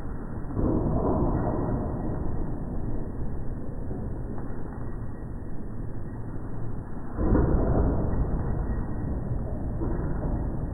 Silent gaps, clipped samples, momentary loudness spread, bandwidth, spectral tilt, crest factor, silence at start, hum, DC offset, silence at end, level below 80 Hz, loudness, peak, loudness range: none; under 0.1%; 12 LU; 2 kHz; -13 dB/octave; 18 dB; 0 s; none; under 0.1%; 0 s; -32 dBFS; -31 LUFS; -10 dBFS; 8 LU